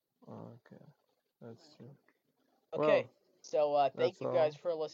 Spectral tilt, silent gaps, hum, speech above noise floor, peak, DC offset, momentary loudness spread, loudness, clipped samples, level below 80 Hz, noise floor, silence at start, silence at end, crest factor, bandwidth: -5.5 dB/octave; none; none; 44 dB; -14 dBFS; under 0.1%; 24 LU; -33 LUFS; under 0.1%; under -90 dBFS; -77 dBFS; 0.25 s; 0.05 s; 20 dB; 7.4 kHz